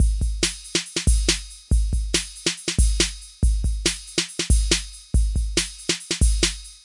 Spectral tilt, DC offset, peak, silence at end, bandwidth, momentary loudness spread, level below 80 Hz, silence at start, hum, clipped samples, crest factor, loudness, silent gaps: -3 dB/octave; under 0.1%; -4 dBFS; 0.1 s; 11.5 kHz; 5 LU; -24 dBFS; 0 s; none; under 0.1%; 16 dB; -23 LUFS; none